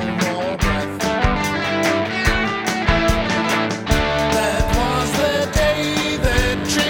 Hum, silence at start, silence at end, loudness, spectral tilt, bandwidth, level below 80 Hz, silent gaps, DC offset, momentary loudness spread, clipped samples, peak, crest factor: none; 0 s; 0 s; -19 LUFS; -4.5 dB/octave; 18 kHz; -26 dBFS; none; under 0.1%; 3 LU; under 0.1%; -2 dBFS; 18 dB